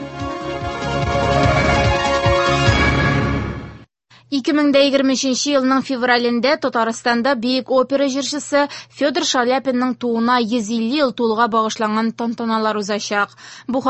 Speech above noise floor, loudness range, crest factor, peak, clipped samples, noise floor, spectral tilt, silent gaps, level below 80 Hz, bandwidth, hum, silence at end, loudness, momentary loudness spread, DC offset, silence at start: 32 dB; 2 LU; 18 dB; 0 dBFS; under 0.1%; -49 dBFS; -5 dB/octave; none; -34 dBFS; 8.6 kHz; none; 0 s; -18 LUFS; 9 LU; under 0.1%; 0 s